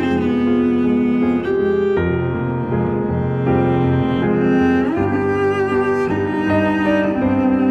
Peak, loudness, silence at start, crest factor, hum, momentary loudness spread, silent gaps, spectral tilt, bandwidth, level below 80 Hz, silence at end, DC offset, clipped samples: -4 dBFS; -17 LUFS; 0 s; 12 dB; none; 4 LU; none; -9 dB/octave; 7 kHz; -44 dBFS; 0 s; under 0.1%; under 0.1%